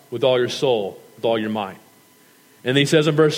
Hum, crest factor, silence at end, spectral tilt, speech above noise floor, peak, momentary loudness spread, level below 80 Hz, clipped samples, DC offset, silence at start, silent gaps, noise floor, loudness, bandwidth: none; 18 dB; 0 s; -5 dB/octave; 34 dB; -2 dBFS; 12 LU; -74 dBFS; under 0.1%; under 0.1%; 0.1 s; none; -53 dBFS; -20 LUFS; 16.5 kHz